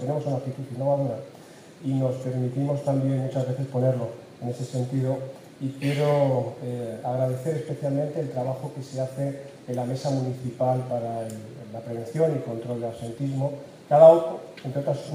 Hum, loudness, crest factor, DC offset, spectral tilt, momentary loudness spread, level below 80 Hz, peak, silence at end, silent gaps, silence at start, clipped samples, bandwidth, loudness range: none; -26 LUFS; 22 dB; under 0.1%; -8 dB/octave; 12 LU; -70 dBFS; -4 dBFS; 0 s; none; 0 s; under 0.1%; 15 kHz; 7 LU